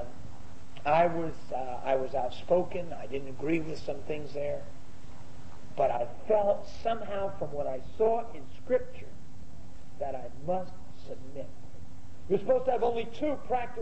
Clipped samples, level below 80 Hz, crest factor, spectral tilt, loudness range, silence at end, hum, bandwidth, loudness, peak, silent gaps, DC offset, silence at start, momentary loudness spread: under 0.1%; -54 dBFS; 18 dB; -7 dB/octave; 6 LU; 0 s; none; 8.6 kHz; -32 LUFS; -12 dBFS; none; 3%; 0 s; 23 LU